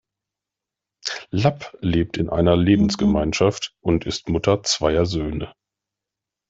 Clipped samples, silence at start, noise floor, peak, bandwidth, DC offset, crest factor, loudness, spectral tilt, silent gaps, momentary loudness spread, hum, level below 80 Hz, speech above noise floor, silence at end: under 0.1%; 1.05 s; -87 dBFS; -4 dBFS; 8 kHz; under 0.1%; 18 dB; -21 LUFS; -5.5 dB/octave; none; 11 LU; none; -40 dBFS; 67 dB; 1 s